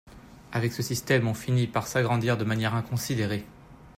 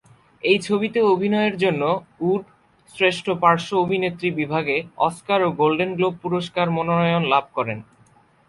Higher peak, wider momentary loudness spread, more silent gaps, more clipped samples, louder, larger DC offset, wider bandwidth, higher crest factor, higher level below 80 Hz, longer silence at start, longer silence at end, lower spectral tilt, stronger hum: second, -10 dBFS vs -2 dBFS; about the same, 6 LU vs 6 LU; neither; neither; second, -27 LUFS vs -21 LUFS; neither; first, 16 kHz vs 11.5 kHz; about the same, 18 dB vs 20 dB; about the same, -56 dBFS vs -60 dBFS; second, 0.05 s vs 0.45 s; second, 0.05 s vs 0.65 s; about the same, -5.5 dB/octave vs -6 dB/octave; neither